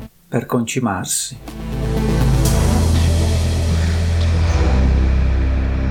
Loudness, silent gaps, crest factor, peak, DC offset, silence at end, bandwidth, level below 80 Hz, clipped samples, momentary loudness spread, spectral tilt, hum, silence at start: -18 LUFS; none; 14 dB; -2 dBFS; under 0.1%; 0 s; 17 kHz; -20 dBFS; under 0.1%; 7 LU; -5.5 dB/octave; none; 0 s